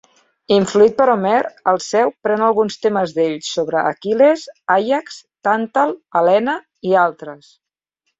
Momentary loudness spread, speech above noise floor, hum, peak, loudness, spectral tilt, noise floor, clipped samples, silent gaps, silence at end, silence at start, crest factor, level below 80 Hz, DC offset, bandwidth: 8 LU; 57 dB; none; -2 dBFS; -17 LUFS; -5 dB/octave; -73 dBFS; under 0.1%; none; 0.85 s; 0.5 s; 16 dB; -62 dBFS; under 0.1%; 7.8 kHz